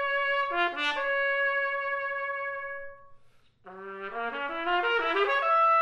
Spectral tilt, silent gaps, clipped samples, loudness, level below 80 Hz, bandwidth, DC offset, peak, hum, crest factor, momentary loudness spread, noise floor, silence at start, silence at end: -3 dB/octave; none; under 0.1%; -28 LUFS; -64 dBFS; 10 kHz; under 0.1%; -14 dBFS; none; 14 dB; 14 LU; -58 dBFS; 0 s; 0 s